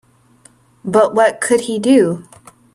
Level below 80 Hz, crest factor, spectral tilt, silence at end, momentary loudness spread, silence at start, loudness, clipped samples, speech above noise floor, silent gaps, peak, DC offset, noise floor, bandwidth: -60 dBFS; 16 dB; -5 dB/octave; 0.55 s; 10 LU; 0.85 s; -14 LUFS; under 0.1%; 36 dB; none; 0 dBFS; under 0.1%; -50 dBFS; 13 kHz